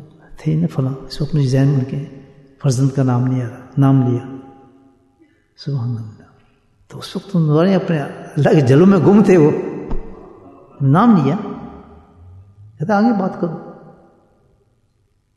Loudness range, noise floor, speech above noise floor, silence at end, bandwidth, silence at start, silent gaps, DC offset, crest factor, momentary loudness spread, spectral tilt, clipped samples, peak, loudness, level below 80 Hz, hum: 9 LU; -61 dBFS; 47 dB; 1.6 s; 11.5 kHz; 0 s; none; under 0.1%; 16 dB; 21 LU; -8.5 dB/octave; under 0.1%; 0 dBFS; -16 LUFS; -40 dBFS; none